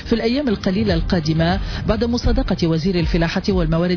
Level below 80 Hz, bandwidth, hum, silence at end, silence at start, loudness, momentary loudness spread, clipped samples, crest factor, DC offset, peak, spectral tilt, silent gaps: -26 dBFS; 5.4 kHz; none; 0 s; 0 s; -19 LUFS; 2 LU; under 0.1%; 12 dB; under 0.1%; -6 dBFS; -7 dB/octave; none